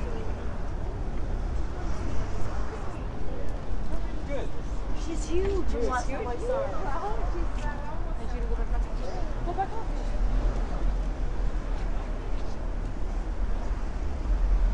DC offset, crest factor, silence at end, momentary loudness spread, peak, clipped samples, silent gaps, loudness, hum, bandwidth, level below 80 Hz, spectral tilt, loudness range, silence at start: under 0.1%; 14 dB; 0 s; 7 LU; -12 dBFS; under 0.1%; none; -33 LUFS; none; 8.8 kHz; -30 dBFS; -6.5 dB/octave; 4 LU; 0 s